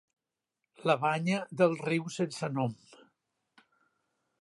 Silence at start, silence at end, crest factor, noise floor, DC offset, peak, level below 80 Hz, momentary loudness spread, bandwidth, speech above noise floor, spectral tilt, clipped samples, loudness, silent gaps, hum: 0.8 s; 1.65 s; 22 dB; -87 dBFS; under 0.1%; -12 dBFS; -78 dBFS; 8 LU; 11.5 kHz; 57 dB; -6 dB/octave; under 0.1%; -31 LUFS; none; none